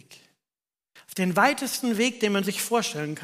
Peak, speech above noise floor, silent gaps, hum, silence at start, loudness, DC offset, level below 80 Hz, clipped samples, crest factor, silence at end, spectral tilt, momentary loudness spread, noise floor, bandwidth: -8 dBFS; over 65 dB; none; none; 0.1 s; -24 LUFS; under 0.1%; -76 dBFS; under 0.1%; 20 dB; 0 s; -3.5 dB/octave; 7 LU; under -90 dBFS; 15.5 kHz